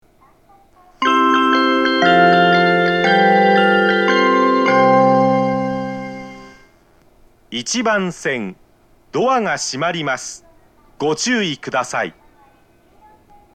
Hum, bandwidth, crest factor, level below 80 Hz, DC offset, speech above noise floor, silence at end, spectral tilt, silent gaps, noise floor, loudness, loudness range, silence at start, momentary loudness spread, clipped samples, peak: none; 9.8 kHz; 16 dB; -56 dBFS; under 0.1%; 33 dB; 1.45 s; -4 dB/octave; none; -52 dBFS; -15 LUFS; 10 LU; 1 s; 14 LU; under 0.1%; 0 dBFS